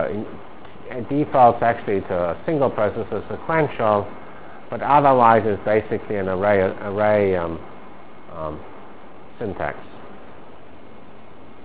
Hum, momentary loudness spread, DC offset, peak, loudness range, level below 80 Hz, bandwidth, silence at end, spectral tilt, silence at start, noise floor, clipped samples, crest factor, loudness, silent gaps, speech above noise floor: none; 25 LU; 2%; 0 dBFS; 15 LU; -48 dBFS; 4 kHz; 0.2 s; -10.5 dB/octave; 0 s; -44 dBFS; under 0.1%; 22 dB; -20 LUFS; none; 25 dB